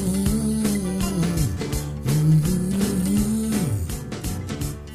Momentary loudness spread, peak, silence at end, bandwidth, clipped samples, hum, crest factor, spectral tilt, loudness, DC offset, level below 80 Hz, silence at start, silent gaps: 10 LU; -8 dBFS; 0 s; 15.5 kHz; under 0.1%; none; 14 dB; -6 dB/octave; -23 LUFS; under 0.1%; -34 dBFS; 0 s; none